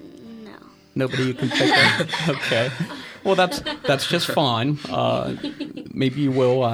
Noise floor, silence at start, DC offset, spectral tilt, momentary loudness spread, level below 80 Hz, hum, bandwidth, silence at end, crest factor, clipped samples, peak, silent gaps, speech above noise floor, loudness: -44 dBFS; 0 s; under 0.1%; -5 dB/octave; 15 LU; -56 dBFS; none; 18.5 kHz; 0 s; 18 dB; under 0.1%; -2 dBFS; none; 24 dB; -21 LUFS